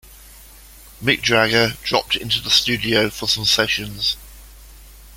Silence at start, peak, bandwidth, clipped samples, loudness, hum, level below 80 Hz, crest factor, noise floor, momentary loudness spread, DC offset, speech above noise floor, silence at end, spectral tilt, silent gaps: 0.1 s; -2 dBFS; 17 kHz; under 0.1%; -17 LUFS; none; -44 dBFS; 20 dB; -43 dBFS; 7 LU; under 0.1%; 24 dB; 0 s; -3 dB/octave; none